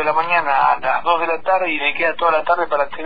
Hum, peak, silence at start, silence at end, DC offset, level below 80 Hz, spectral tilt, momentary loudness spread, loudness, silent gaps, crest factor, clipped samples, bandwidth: none; -2 dBFS; 0 s; 0 s; 4%; -50 dBFS; -6 dB/octave; 2 LU; -17 LUFS; none; 14 dB; under 0.1%; 5 kHz